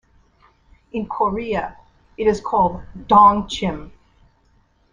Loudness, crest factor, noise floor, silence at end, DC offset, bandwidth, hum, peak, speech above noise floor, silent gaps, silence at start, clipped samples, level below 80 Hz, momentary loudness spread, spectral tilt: -18 LUFS; 20 dB; -59 dBFS; 1.05 s; under 0.1%; 9.8 kHz; none; -2 dBFS; 41 dB; none; 0.95 s; under 0.1%; -44 dBFS; 19 LU; -6 dB/octave